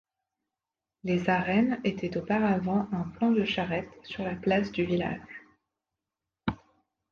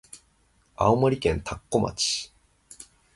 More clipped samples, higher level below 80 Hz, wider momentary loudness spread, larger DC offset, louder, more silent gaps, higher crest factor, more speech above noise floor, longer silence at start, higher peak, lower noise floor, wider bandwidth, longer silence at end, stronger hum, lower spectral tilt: neither; second, -58 dBFS vs -46 dBFS; second, 14 LU vs 24 LU; neither; second, -29 LUFS vs -25 LUFS; neither; about the same, 18 dB vs 22 dB; first, 62 dB vs 40 dB; first, 1.05 s vs 0.15 s; second, -12 dBFS vs -6 dBFS; first, -90 dBFS vs -64 dBFS; second, 7 kHz vs 11.5 kHz; first, 0.55 s vs 0.35 s; neither; first, -7.5 dB/octave vs -4.5 dB/octave